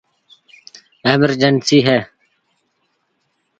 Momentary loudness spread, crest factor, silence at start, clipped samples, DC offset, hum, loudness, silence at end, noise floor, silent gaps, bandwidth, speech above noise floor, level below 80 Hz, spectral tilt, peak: 8 LU; 18 dB; 1.05 s; under 0.1%; under 0.1%; none; -14 LUFS; 1.55 s; -67 dBFS; none; 9.2 kHz; 54 dB; -58 dBFS; -5 dB/octave; 0 dBFS